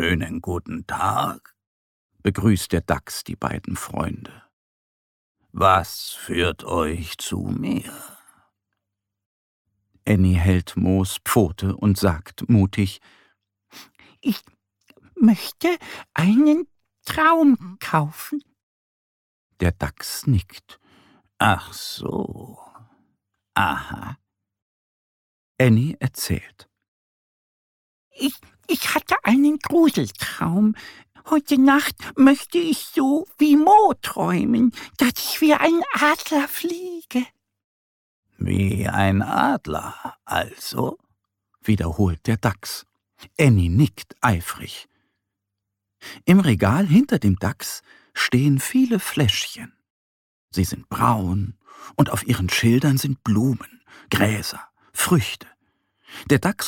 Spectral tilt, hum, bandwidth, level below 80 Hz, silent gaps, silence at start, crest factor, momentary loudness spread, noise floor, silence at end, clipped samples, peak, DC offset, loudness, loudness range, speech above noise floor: -5.5 dB/octave; none; 17.5 kHz; -44 dBFS; 1.67-2.10 s, 4.53-5.35 s, 9.26-9.65 s, 18.63-19.50 s, 24.62-25.55 s, 26.88-28.11 s, 37.64-38.23 s, 49.90-50.48 s; 0 s; 18 dB; 14 LU; -82 dBFS; 0 s; under 0.1%; -4 dBFS; under 0.1%; -21 LUFS; 8 LU; 62 dB